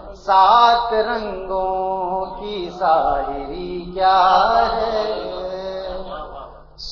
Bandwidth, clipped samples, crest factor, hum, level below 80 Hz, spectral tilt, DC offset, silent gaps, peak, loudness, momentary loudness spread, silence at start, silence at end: 6.8 kHz; under 0.1%; 16 dB; none; -40 dBFS; -5 dB/octave; under 0.1%; none; -2 dBFS; -18 LUFS; 16 LU; 0 s; 0 s